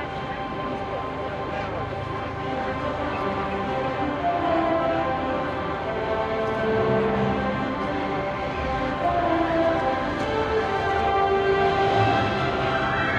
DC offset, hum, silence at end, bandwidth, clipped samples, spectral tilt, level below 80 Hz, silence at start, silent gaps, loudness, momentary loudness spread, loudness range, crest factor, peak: under 0.1%; none; 0 s; 9.6 kHz; under 0.1%; -6.5 dB/octave; -44 dBFS; 0 s; none; -24 LUFS; 8 LU; 5 LU; 14 dB; -10 dBFS